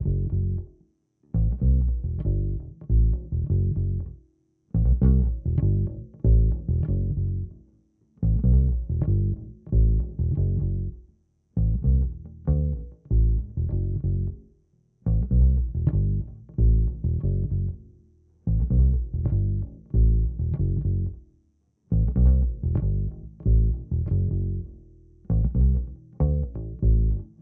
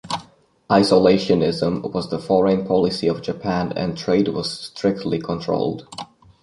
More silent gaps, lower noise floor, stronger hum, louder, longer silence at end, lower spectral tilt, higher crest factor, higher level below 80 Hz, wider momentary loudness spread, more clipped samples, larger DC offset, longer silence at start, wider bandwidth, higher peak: neither; first, -66 dBFS vs -49 dBFS; neither; second, -25 LUFS vs -20 LUFS; second, 0.15 s vs 0.4 s; first, -15.5 dB/octave vs -6.5 dB/octave; about the same, 14 dB vs 18 dB; first, -26 dBFS vs -50 dBFS; about the same, 10 LU vs 12 LU; neither; neither; about the same, 0 s vs 0.05 s; second, 1.2 kHz vs 11.5 kHz; second, -8 dBFS vs -2 dBFS